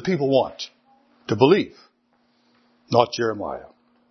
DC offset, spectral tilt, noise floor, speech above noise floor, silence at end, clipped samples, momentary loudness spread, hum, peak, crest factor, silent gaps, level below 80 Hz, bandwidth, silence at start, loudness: under 0.1%; -6 dB/octave; -65 dBFS; 45 dB; 0.45 s; under 0.1%; 18 LU; none; 0 dBFS; 24 dB; none; -64 dBFS; 6.4 kHz; 0 s; -21 LUFS